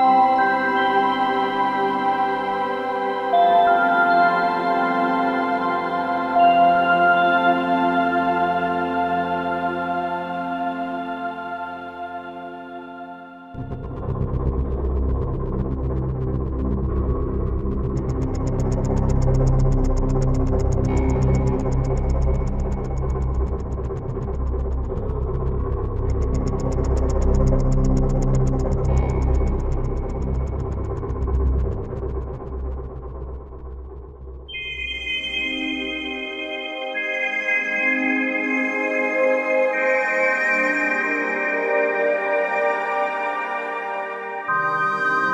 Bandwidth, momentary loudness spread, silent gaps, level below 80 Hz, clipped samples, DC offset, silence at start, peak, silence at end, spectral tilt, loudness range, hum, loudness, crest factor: 8 kHz; 13 LU; none; -26 dBFS; under 0.1%; under 0.1%; 0 s; -6 dBFS; 0 s; -7 dB/octave; 9 LU; none; -21 LUFS; 16 dB